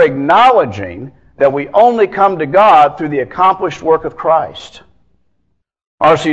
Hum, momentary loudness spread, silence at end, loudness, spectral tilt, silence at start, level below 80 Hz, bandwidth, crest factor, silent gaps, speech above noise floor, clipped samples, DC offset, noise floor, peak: none; 13 LU; 0 s; -11 LUFS; -6 dB/octave; 0 s; -50 dBFS; 8.8 kHz; 12 dB; 5.87-5.98 s; 53 dB; 0.3%; under 0.1%; -64 dBFS; 0 dBFS